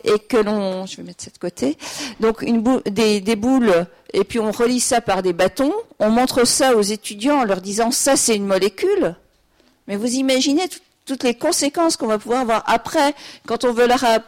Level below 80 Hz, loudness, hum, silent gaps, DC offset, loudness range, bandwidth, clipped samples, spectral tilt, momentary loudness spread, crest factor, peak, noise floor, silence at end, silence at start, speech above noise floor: -50 dBFS; -18 LUFS; none; none; under 0.1%; 3 LU; 16.5 kHz; under 0.1%; -3.5 dB/octave; 11 LU; 12 dB; -6 dBFS; -58 dBFS; 0.05 s; 0.05 s; 40 dB